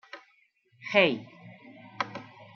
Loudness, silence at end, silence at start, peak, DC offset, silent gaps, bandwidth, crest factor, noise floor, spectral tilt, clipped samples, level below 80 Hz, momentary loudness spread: -27 LUFS; 0.1 s; 0.15 s; -8 dBFS; under 0.1%; none; 6.8 kHz; 24 dB; -67 dBFS; -5.5 dB/octave; under 0.1%; -80 dBFS; 26 LU